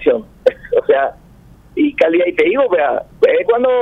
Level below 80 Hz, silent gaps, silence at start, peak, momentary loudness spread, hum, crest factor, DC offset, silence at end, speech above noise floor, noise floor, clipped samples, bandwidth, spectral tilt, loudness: -48 dBFS; none; 0 s; 0 dBFS; 5 LU; none; 14 dB; under 0.1%; 0 s; 30 dB; -43 dBFS; under 0.1%; 5.6 kHz; -6.5 dB/octave; -15 LUFS